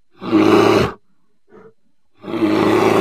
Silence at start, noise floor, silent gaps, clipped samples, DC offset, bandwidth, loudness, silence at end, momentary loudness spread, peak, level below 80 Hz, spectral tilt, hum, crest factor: 0.2 s; -66 dBFS; none; under 0.1%; 0.3%; 14.5 kHz; -15 LUFS; 0 s; 13 LU; 0 dBFS; -46 dBFS; -6 dB/octave; none; 16 dB